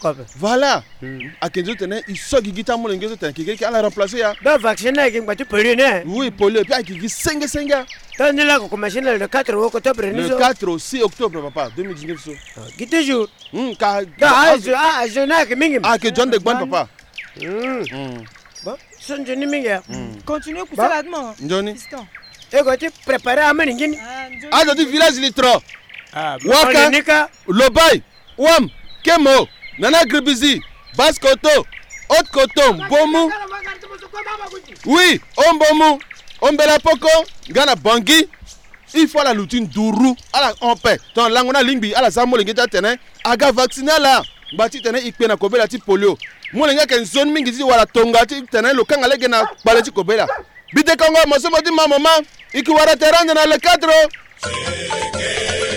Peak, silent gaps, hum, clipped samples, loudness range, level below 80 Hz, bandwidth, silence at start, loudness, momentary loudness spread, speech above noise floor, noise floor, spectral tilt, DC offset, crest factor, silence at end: 0 dBFS; none; none; under 0.1%; 8 LU; -44 dBFS; 19.5 kHz; 0 s; -15 LUFS; 16 LU; 25 dB; -40 dBFS; -3 dB/octave; under 0.1%; 16 dB; 0 s